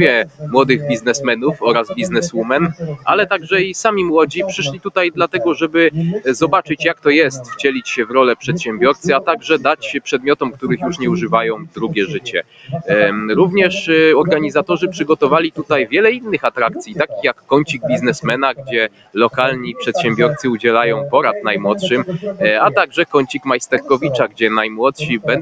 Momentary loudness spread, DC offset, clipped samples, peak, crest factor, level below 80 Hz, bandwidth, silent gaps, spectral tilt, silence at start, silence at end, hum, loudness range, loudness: 6 LU; under 0.1%; under 0.1%; 0 dBFS; 16 dB; -54 dBFS; 9.4 kHz; none; -5 dB/octave; 0 s; 0 s; none; 3 LU; -15 LUFS